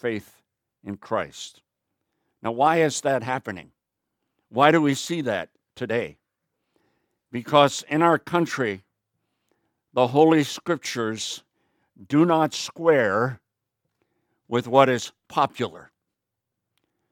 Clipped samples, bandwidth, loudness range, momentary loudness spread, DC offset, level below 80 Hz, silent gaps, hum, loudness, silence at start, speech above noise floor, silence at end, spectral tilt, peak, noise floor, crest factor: under 0.1%; 17 kHz; 4 LU; 18 LU; under 0.1%; -70 dBFS; none; none; -23 LUFS; 0.05 s; 61 dB; 1.3 s; -5 dB/octave; -2 dBFS; -83 dBFS; 24 dB